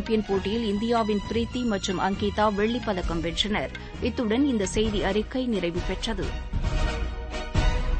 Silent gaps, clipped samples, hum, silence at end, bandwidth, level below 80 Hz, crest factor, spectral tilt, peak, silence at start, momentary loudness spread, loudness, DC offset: none; under 0.1%; none; 0 s; 8.8 kHz; -32 dBFS; 16 dB; -5.5 dB/octave; -10 dBFS; 0 s; 7 LU; -27 LUFS; under 0.1%